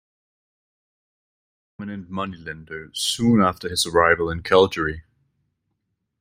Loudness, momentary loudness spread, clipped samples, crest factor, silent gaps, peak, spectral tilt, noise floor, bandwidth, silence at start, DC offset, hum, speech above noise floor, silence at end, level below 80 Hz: -20 LUFS; 17 LU; under 0.1%; 22 dB; none; -2 dBFS; -4 dB/octave; -76 dBFS; 16.5 kHz; 1.8 s; under 0.1%; none; 55 dB; 1.2 s; -50 dBFS